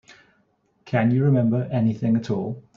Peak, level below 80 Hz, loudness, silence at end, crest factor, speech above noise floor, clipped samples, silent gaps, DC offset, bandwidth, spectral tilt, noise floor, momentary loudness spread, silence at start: -6 dBFS; -60 dBFS; -22 LUFS; 0.15 s; 16 dB; 45 dB; under 0.1%; none; under 0.1%; 7 kHz; -9.5 dB/octave; -66 dBFS; 8 LU; 0.85 s